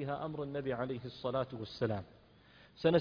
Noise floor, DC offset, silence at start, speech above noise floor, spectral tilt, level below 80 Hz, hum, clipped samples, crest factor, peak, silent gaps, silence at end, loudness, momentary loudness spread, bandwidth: -62 dBFS; under 0.1%; 0 s; 26 dB; -5.5 dB/octave; -66 dBFS; none; under 0.1%; 20 dB; -16 dBFS; none; 0 s; -38 LUFS; 6 LU; 5.2 kHz